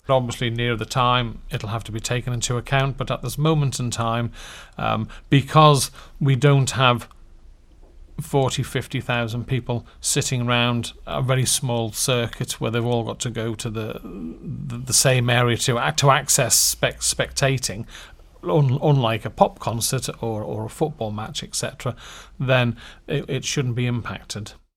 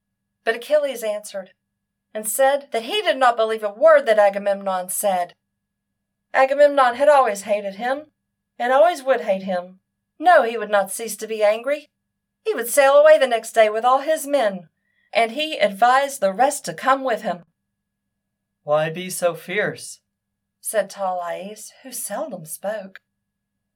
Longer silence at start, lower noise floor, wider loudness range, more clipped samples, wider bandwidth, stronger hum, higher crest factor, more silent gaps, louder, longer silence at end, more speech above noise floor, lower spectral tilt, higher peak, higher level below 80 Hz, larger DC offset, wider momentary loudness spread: second, 0.1 s vs 0.45 s; second, -47 dBFS vs -79 dBFS; second, 6 LU vs 9 LU; neither; about the same, 18.5 kHz vs 18.5 kHz; neither; about the same, 22 dB vs 18 dB; neither; about the same, -21 LUFS vs -19 LUFS; second, 0.25 s vs 0.9 s; second, 25 dB vs 59 dB; first, -4 dB/octave vs -2.5 dB/octave; first, 0 dBFS vs -4 dBFS; first, -44 dBFS vs -84 dBFS; neither; about the same, 14 LU vs 15 LU